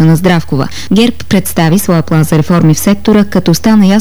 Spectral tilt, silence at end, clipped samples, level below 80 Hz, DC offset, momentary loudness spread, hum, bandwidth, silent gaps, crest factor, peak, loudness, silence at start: -6 dB/octave; 0 s; 0.3%; -32 dBFS; 8%; 5 LU; none; over 20 kHz; none; 8 dB; 0 dBFS; -9 LUFS; 0 s